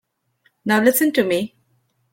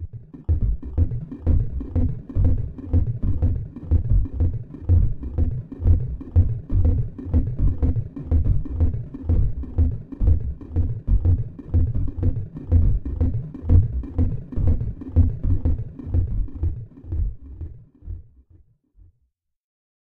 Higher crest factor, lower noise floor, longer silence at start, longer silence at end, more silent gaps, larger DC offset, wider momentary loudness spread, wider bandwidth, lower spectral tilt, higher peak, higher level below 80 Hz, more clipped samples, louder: about the same, 18 dB vs 18 dB; second, -65 dBFS vs -71 dBFS; first, 0.65 s vs 0 s; second, 0.65 s vs 1.8 s; neither; neither; first, 14 LU vs 9 LU; first, 17 kHz vs 2 kHz; second, -4 dB/octave vs -12.5 dB/octave; about the same, -2 dBFS vs -4 dBFS; second, -64 dBFS vs -24 dBFS; neither; first, -18 LUFS vs -24 LUFS